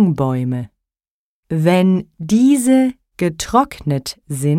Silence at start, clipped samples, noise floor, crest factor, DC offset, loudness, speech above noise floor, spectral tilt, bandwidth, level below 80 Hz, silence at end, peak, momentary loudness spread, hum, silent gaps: 0 s; under 0.1%; under -90 dBFS; 14 dB; under 0.1%; -17 LUFS; over 75 dB; -6.5 dB/octave; 16 kHz; -46 dBFS; 0 s; -2 dBFS; 11 LU; none; 1.11-1.43 s